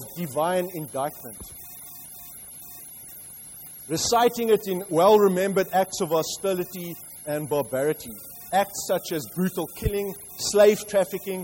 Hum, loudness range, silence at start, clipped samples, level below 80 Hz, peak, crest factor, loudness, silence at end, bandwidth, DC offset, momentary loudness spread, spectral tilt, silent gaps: none; 9 LU; 0 s; under 0.1%; -50 dBFS; -6 dBFS; 20 dB; -24 LUFS; 0 s; 16.5 kHz; under 0.1%; 20 LU; -4 dB/octave; none